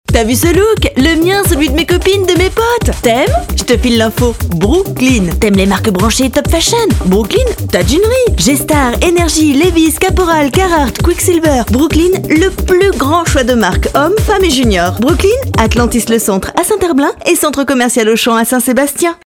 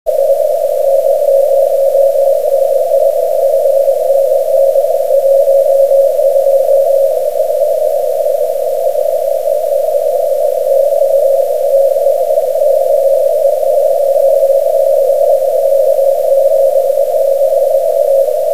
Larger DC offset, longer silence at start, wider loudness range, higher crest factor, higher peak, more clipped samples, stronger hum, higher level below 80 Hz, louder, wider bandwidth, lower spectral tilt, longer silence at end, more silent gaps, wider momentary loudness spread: second, under 0.1% vs 5%; about the same, 0.1 s vs 0.05 s; about the same, 1 LU vs 2 LU; about the same, 10 dB vs 10 dB; about the same, 0 dBFS vs 0 dBFS; first, 0.1% vs under 0.1%; neither; first, -20 dBFS vs -58 dBFS; about the same, -10 LUFS vs -11 LUFS; first, 18 kHz vs 16 kHz; first, -4.5 dB/octave vs -2.5 dB/octave; about the same, 0.1 s vs 0 s; neither; about the same, 2 LU vs 4 LU